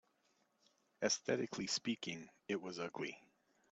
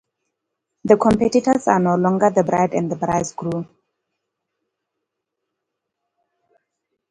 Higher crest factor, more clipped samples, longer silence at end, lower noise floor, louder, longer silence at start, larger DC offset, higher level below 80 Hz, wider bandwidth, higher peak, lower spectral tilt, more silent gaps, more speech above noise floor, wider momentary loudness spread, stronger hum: about the same, 22 dB vs 20 dB; neither; second, 0.55 s vs 3.45 s; about the same, -79 dBFS vs -80 dBFS; second, -41 LUFS vs -18 LUFS; first, 1 s vs 0.85 s; neither; second, -82 dBFS vs -52 dBFS; second, 8.4 kHz vs 11 kHz; second, -22 dBFS vs 0 dBFS; second, -3 dB/octave vs -6.5 dB/octave; neither; second, 37 dB vs 63 dB; about the same, 10 LU vs 11 LU; neither